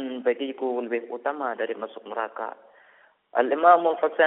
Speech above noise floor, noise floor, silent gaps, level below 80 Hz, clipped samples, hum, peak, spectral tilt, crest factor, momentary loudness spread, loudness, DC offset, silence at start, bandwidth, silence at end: 34 dB; -58 dBFS; none; -78 dBFS; under 0.1%; none; -4 dBFS; -1 dB/octave; 20 dB; 15 LU; -25 LUFS; under 0.1%; 0 s; 4 kHz; 0 s